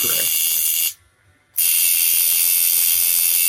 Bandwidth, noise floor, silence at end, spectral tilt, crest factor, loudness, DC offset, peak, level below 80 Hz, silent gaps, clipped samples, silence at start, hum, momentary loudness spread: 17 kHz; -57 dBFS; 0 s; 2.5 dB/octave; 16 dB; -14 LUFS; under 0.1%; -2 dBFS; -64 dBFS; none; under 0.1%; 0 s; none; 5 LU